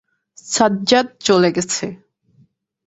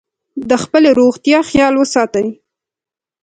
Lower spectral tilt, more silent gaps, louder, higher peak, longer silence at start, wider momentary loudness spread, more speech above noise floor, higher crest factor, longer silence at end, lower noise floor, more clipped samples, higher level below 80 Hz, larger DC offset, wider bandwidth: about the same, -3.5 dB/octave vs -4.5 dB/octave; neither; second, -17 LUFS vs -12 LUFS; about the same, 0 dBFS vs 0 dBFS; about the same, 0.45 s vs 0.35 s; second, 9 LU vs 12 LU; second, 40 dB vs 77 dB; about the same, 18 dB vs 14 dB; about the same, 0.9 s vs 0.9 s; second, -57 dBFS vs -89 dBFS; neither; second, -56 dBFS vs -46 dBFS; neither; second, 8.2 kHz vs 9.4 kHz